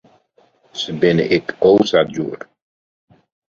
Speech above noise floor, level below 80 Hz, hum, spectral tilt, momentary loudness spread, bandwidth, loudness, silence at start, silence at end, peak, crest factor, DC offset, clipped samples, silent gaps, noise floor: 41 dB; -56 dBFS; none; -6 dB/octave; 14 LU; 7.4 kHz; -16 LUFS; 0.75 s; 1.25 s; -2 dBFS; 18 dB; under 0.1%; under 0.1%; none; -57 dBFS